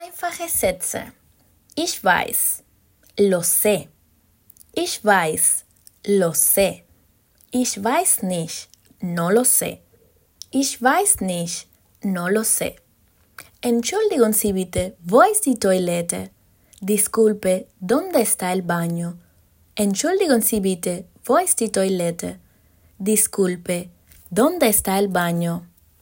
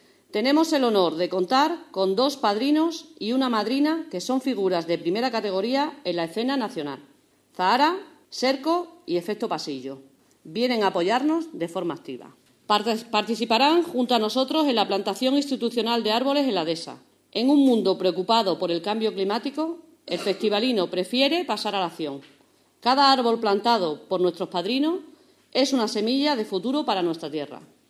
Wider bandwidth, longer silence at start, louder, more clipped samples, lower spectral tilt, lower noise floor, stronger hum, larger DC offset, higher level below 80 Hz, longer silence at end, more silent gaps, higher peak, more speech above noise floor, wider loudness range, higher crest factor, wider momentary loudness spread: first, 17 kHz vs 14 kHz; second, 0 s vs 0.35 s; first, -19 LUFS vs -24 LUFS; neither; about the same, -3.5 dB/octave vs -4.5 dB/octave; about the same, -60 dBFS vs -58 dBFS; neither; neither; first, -54 dBFS vs -78 dBFS; about the same, 0.35 s vs 0.25 s; neither; about the same, -2 dBFS vs -4 dBFS; first, 40 dB vs 34 dB; about the same, 2 LU vs 3 LU; about the same, 20 dB vs 20 dB; first, 14 LU vs 11 LU